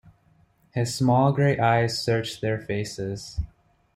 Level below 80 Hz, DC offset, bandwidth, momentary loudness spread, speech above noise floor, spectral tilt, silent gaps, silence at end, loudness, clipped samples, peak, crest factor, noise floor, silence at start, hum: -46 dBFS; under 0.1%; 15.5 kHz; 14 LU; 38 dB; -6 dB/octave; none; 0.5 s; -24 LUFS; under 0.1%; -6 dBFS; 18 dB; -61 dBFS; 0.75 s; none